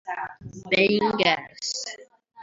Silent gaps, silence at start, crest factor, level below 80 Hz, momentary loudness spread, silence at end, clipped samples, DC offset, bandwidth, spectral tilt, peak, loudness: none; 0.05 s; 20 dB; -62 dBFS; 17 LU; 0 s; under 0.1%; under 0.1%; 7.8 kHz; -3.5 dB/octave; -6 dBFS; -23 LUFS